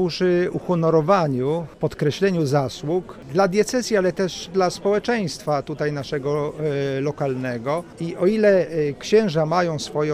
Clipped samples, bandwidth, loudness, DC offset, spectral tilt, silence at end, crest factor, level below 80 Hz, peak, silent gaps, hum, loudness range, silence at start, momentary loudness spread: under 0.1%; 15 kHz; -22 LUFS; under 0.1%; -6 dB/octave; 0 s; 16 dB; -54 dBFS; -4 dBFS; none; none; 3 LU; 0 s; 8 LU